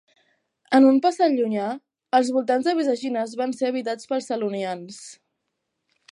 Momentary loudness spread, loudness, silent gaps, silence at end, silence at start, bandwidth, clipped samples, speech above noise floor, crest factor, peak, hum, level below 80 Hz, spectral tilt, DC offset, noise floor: 15 LU; -22 LUFS; none; 1 s; 0.7 s; 11 kHz; under 0.1%; 57 dB; 18 dB; -6 dBFS; none; -78 dBFS; -5 dB/octave; under 0.1%; -79 dBFS